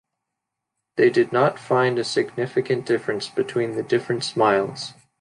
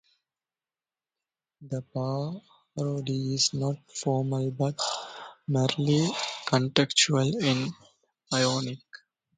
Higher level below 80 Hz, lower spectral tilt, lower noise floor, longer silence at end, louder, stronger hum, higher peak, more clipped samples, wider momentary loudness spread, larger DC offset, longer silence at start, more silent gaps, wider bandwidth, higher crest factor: about the same, -66 dBFS vs -66 dBFS; about the same, -5.5 dB/octave vs -4.5 dB/octave; second, -82 dBFS vs under -90 dBFS; about the same, 0.3 s vs 0.4 s; first, -22 LUFS vs -27 LUFS; neither; second, -6 dBFS vs -2 dBFS; neither; second, 7 LU vs 13 LU; neither; second, 0.95 s vs 1.6 s; neither; first, 11 kHz vs 9.6 kHz; second, 18 dB vs 28 dB